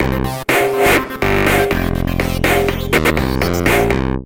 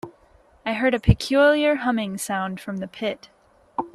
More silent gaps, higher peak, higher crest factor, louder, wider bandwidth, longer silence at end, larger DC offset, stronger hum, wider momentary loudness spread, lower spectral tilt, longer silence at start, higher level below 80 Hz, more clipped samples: neither; about the same, -4 dBFS vs -2 dBFS; second, 12 dB vs 20 dB; first, -15 LUFS vs -22 LUFS; first, 17 kHz vs 14 kHz; about the same, 0 s vs 0.05 s; first, 1% vs under 0.1%; neither; second, 5 LU vs 15 LU; about the same, -5 dB/octave vs -5.5 dB/octave; about the same, 0 s vs 0.05 s; first, -26 dBFS vs -38 dBFS; neither